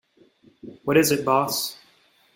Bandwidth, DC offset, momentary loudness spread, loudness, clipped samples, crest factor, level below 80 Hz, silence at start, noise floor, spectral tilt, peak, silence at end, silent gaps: 16.5 kHz; under 0.1%; 12 LU; -22 LUFS; under 0.1%; 20 dB; -62 dBFS; 0.65 s; -60 dBFS; -4 dB/octave; -6 dBFS; 0.6 s; none